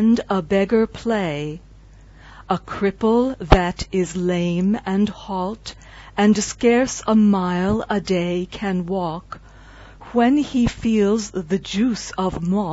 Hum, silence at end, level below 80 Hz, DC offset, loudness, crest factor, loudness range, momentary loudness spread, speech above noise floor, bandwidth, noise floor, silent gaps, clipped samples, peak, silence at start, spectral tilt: none; 0 s; -34 dBFS; under 0.1%; -20 LUFS; 20 dB; 3 LU; 10 LU; 25 dB; 8 kHz; -45 dBFS; none; under 0.1%; 0 dBFS; 0 s; -6 dB/octave